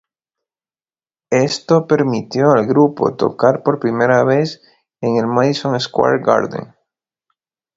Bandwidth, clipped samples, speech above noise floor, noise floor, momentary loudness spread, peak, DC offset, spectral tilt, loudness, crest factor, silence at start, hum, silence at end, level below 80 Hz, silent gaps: 7.8 kHz; under 0.1%; over 75 dB; under -90 dBFS; 6 LU; 0 dBFS; under 0.1%; -6 dB/octave; -15 LUFS; 16 dB; 1.3 s; none; 1.15 s; -58 dBFS; none